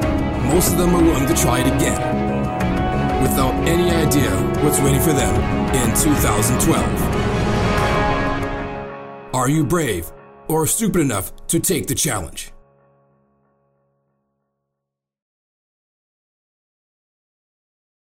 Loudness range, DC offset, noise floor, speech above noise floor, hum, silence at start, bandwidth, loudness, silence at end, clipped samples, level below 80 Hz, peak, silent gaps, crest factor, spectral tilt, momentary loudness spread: 6 LU; under 0.1%; -82 dBFS; 65 dB; none; 0 s; 16.5 kHz; -18 LUFS; 5.5 s; under 0.1%; -30 dBFS; -4 dBFS; none; 16 dB; -5 dB/octave; 10 LU